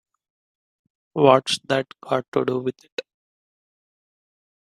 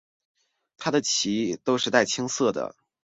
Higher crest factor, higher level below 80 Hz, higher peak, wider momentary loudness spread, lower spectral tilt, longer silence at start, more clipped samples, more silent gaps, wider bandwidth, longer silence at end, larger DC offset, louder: about the same, 24 dB vs 24 dB; about the same, -68 dBFS vs -66 dBFS; first, 0 dBFS vs -4 dBFS; first, 18 LU vs 10 LU; first, -5 dB/octave vs -3 dB/octave; first, 1.15 s vs 0.8 s; neither; first, 2.28-2.32 s, 2.92-2.97 s vs none; first, 13 kHz vs 8 kHz; first, 1.75 s vs 0.35 s; neither; first, -21 LUFS vs -25 LUFS